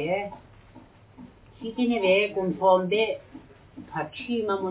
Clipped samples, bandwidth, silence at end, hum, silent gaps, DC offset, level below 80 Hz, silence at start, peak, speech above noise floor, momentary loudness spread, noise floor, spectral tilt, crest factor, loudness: under 0.1%; 4 kHz; 0 s; none; none; under 0.1%; -60 dBFS; 0 s; -8 dBFS; 27 dB; 15 LU; -51 dBFS; -9.5 dB/octave; 20 dB; -25 LUFS